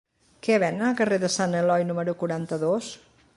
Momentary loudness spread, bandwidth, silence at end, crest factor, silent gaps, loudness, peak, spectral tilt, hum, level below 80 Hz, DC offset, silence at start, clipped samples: 7 LU; 11.5 kHz; 0.4 s; 16 dB; none; -25 LUFS; -8 dBFS; -5 dB/octave; none; -68 dBFS; under 0.1%; 0.45 s; under 0.1%